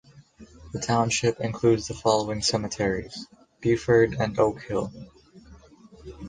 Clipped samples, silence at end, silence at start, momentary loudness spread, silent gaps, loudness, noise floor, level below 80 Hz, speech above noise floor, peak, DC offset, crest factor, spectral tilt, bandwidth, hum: under 0.1%; 0 s; 0.15 s; 16 LU; none; -25 LUFS; -51 dBFS; -50 dBFS; 26 dB; -8 dBFS; under 0.1%; 18 dB; -5 dB/octave; 9.8 kHz; none